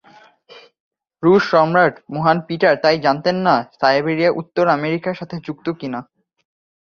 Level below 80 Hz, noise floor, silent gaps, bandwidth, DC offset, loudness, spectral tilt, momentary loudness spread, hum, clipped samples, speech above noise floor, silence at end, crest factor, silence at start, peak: -60 dBFS; -49 dBFS; 0.80-0.91 s; 7 kHz; under 0.1%; -17 LUFS; -7 dB/octave; 12 LU; none; under 0.1%; 32 dB; 0.8 s; 16 dB; 0.55 s; -2 dBFS